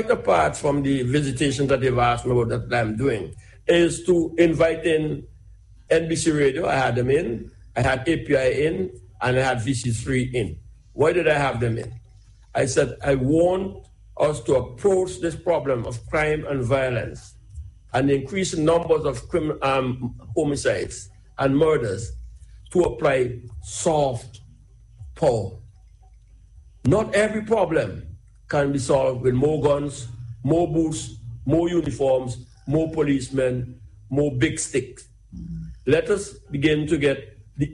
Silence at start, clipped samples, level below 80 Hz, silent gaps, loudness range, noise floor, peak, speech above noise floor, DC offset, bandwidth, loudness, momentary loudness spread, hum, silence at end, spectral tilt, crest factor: 0 s; under 0.1%; -44 dBFS; none; 3 LU; -49 dBFS; -4 dBFS; 28 dB; under 0.1%; 11.5 kHz; -22 LUFS; 13 LU; none; 0 s; -6 dB/octave; 18 dB